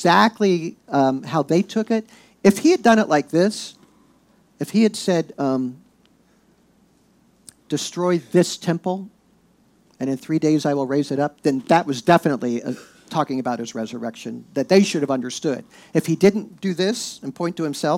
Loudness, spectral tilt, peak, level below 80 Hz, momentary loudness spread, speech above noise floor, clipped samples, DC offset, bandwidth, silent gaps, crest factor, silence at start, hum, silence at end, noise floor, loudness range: -21 LUFS; -5.5 dB/octave; -2 dBFS; -66 dBFS; 12 LU; 38 dB; under 0.1%; under 0.1%; 16 kHz; none; 18 dB; 0 s; none; 0 s; -58 dBFS; 6 LU